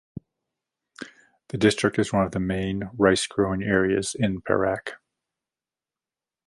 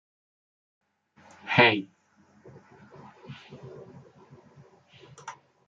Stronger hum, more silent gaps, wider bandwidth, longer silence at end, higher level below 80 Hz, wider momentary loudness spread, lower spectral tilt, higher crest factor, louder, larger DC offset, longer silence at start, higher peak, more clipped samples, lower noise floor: neither; neither; first, 11.5 kHz vs 7.8 kHz; first, 1.5 s vs 0.35 s; first, -50 dBFS vs -74 dBFS; second, 21 LU vs 28 LU; about the same, -5 dB/octave vs -5.5 dB/octave; second, 22 dB vs 28 dB; about the same, -24 LUFS vs -22 LUFS; neither; second, 1 s vs 1.45 s; about the same, -4 dBFS vs -6 dBFS; neither; first, under -90 dBFS vs -61 dBFS